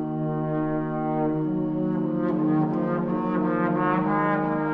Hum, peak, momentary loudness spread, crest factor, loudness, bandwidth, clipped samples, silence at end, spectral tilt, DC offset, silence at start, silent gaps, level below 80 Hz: none; -10 dBFS; 4 LU; 14 dB; -25 LUFS; 4.2 kHz; under 0.1%; 0 s; -11 dB/octave; under 0.1%; 0 s; none; -54 dBFS